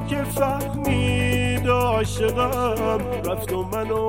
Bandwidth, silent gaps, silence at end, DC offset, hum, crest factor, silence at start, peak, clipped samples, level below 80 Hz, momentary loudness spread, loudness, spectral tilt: 17 kHz; none; 0 s; 0.4%; none; 14 dB; 0 s; -8 dBFS; under 0.1%; -36 dBFS; 6 LU; -22 LUFS; -5.5 dB/octave